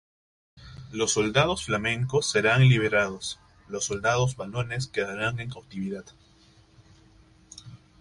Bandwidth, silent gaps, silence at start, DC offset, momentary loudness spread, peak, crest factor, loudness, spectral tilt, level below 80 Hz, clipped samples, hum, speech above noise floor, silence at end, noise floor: 11.5 kHz; none; 0.6 s; under 0.1%; 19 LU; -8 dBFS; 20 dB; -25 LUFS; -4.5 dB/octave; -54 dBFS; under 0.1%; none; 32 dB; 0.25 s; -58 dBFS